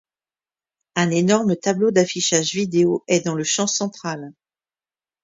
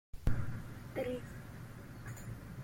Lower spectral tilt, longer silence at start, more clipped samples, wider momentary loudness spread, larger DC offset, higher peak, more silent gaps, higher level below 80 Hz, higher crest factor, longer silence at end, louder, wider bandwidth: second, -4 dB/octave vs -7 dB/octave; first, 0.95 s vs 0.15 s; neither; about the same, 11 LU vs 11 LU; neither; first, -2 dBFS vs -20 dBFS; neither; second, -64 dBFS vs -46 dBFS; about the same, 20 dB vs 20 dB; first, 0.95 s vs 0 s; first, -20 LUFS vs -44 LUFS; second, 7.8 kHz vs 16.5 kHz